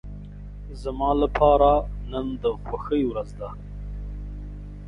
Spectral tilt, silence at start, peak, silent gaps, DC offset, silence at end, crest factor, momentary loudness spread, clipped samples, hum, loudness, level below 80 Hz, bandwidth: -8.5 dB/octave; 0.05 s; -6 dBFS; none; under 0.1%; 0 s; 20 dB; 21 LU; under 0.1%; 50 Hz at -35 dBFS; -23 LUFS; -34 dBFS; 10 kHz